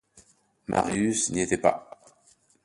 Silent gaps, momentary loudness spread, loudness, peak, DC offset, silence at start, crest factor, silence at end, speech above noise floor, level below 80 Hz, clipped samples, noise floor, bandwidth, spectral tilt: none; 11 LU; -26 LUFS; -6 dBFS; under 0.1%; 0.15 s; 22 dB; 0.8 s; 37 dB; -56 dBFS; under 0.1%; -63 dBFS; 11.5 kHz; -4 dB/octave